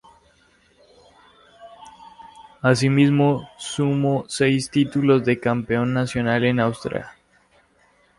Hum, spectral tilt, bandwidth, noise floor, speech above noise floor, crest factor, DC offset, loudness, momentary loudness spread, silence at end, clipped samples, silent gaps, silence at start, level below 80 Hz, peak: none; -6 dB/octave; 11.5 kHz; -59 dBFS; 40 dB; 18 dB; under 0.1%; -20 LUFS; 11 LU; 1.1 s; under 0.1%; none; 1.6 s; -54 dBFS; -4 dBFS